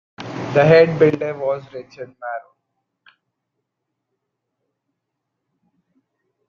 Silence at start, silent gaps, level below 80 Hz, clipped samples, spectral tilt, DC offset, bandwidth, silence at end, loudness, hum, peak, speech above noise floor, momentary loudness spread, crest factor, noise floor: 0.2 s; none; -62 dBFS; under 0.1%; -7.5 dB/octave; under 0.1%; 7 kHz; 4.1 s; -16 LUFS; none; -2 dBFS; 62 dB; 22 LU; 20 dB; -78 dBFS